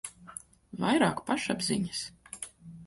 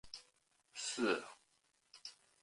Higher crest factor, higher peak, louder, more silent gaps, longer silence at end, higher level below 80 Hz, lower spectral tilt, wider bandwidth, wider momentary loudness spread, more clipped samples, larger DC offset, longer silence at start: about the same, 20 dB vs 24 dB; first, -14 dBFS vs -20 dBFS; first, -30 LUFS vs -39 LUFS; neither; second, 0 s vs 0.3 s; first, -64 dBFS vs -80 dBFS; first, -4 dB/octave vs -2 dB/octave; about the same, 12 kHz vs 11.5 kHz; about the same, 19 LU vs 17 LU; neither; neither; about the same, 0.05 s vs 0.05 s